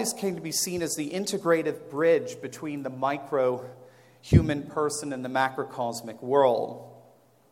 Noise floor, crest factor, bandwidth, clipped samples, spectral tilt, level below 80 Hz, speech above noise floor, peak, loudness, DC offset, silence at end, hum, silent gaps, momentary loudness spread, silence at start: -58 dBFS; 22 dB; 16.5 kHz; under 0.1%; -5 dB/octave; -46 dBFS; 32 dB; -6 dBFS; -27 LUFS; under 0.1%; 0.5 s; none; none; 13 LU; 0 s